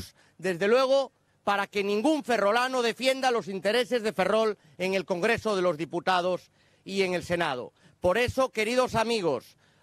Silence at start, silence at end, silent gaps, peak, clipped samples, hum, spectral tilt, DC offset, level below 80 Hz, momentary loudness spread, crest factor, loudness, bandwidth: 0 s; 0.4 s; none; -12 dBFS; under 0.1%; none; -4.5 dB/octave; under 0.1%; -60 dBFS; 8 LU; 16 dB; -27 LUFS; 14.5 kHz